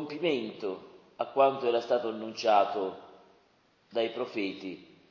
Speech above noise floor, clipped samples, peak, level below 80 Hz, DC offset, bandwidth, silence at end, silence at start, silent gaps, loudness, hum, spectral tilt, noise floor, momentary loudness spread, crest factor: 37 dB; under 0.1%; -12 dBFS; -78 dBFS; under 0.1%; 7.2 kHz; 0.25 s; 0 s; none; -30 LUFS; none; -5 dB/octave; -67 dBFS; 16 LU; 20 dB